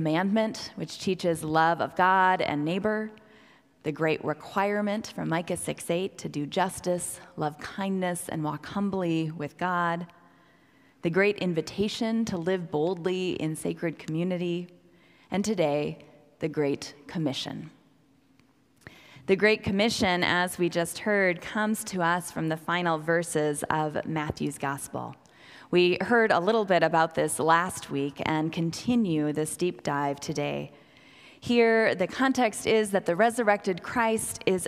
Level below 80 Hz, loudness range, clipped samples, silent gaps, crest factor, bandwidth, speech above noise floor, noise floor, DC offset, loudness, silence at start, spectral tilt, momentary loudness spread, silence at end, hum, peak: -62 dBFS; 6 LU; under 0.1%; none; 20 dB; 16 kHz; 36 dB; -63 dBFS; under 0.1%; -27 LUFS; 0 s; -5 dB/octave; 11 LU; 0 s; none; -8 dBFS